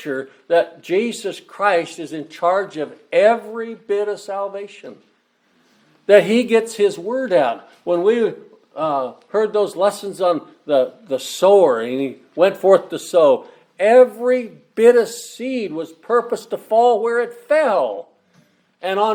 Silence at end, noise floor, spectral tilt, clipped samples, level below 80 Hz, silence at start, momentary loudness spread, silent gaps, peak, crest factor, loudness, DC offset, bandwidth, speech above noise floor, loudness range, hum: 0 s; -61 dBFS; -4.5 dB/octave; under 0.1%; -72 dBFS; 0 s; 15 LU; none; 0 dBFS; 18 dB; -18 LUFS; under 0.1%; 15.5 kHz; 44 dB; 5 LU; none